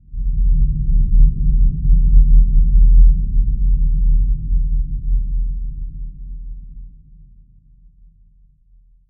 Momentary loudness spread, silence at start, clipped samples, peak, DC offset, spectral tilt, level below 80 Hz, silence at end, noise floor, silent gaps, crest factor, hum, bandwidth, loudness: 19 LU; 0.1 s; under 0.1%; 0 dBFS; under 0.1%; -26 dB/octave; -14 dBFS; 2.2 s; -51 dBFS; none; 14 dB; none; 0.4 kHz; -18 LUFS